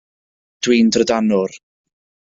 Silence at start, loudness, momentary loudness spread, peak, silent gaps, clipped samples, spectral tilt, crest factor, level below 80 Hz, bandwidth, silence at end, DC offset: 0.6 s; -16 LUFS; 10 LU; -2 dBFS; none; under 0.1%; -4.5 dB/octave; 16 dB; -56 dBFS; 7.8 kHz; 0.8 s; under 0.1%